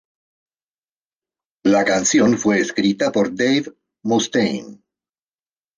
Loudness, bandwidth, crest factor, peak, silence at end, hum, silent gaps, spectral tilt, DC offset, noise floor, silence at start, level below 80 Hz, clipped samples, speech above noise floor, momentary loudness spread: -18 LUFS; 10 kHz; 16 dB; -4 dBFS; 1.05 s; none; none; -4 dB/octave; under 0.1%; under -90 dBFS; 1.65 s; -60 dBFS; under 0.1%; over 72 dB; 7 LU